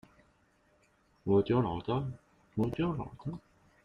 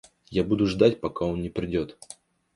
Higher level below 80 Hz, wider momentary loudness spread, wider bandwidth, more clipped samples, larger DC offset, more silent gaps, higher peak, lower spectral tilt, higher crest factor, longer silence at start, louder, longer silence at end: second, -58 dBFS vs -48 dBFS; second, 15 LU vs 22 LU; second, 7 kHz vs 11.5 kHz; neither; neither; neither; second, -18 dBFS vs -6 dBFS; first, -9.5 dB/octave vs -7 dB/octave; about the same, 18 dB vs 20 dB; first, 1.25 s vs 0.3 s; second, -33 LUFS vs -26 LUFS; about the same, 0.45 s vs 0.4 s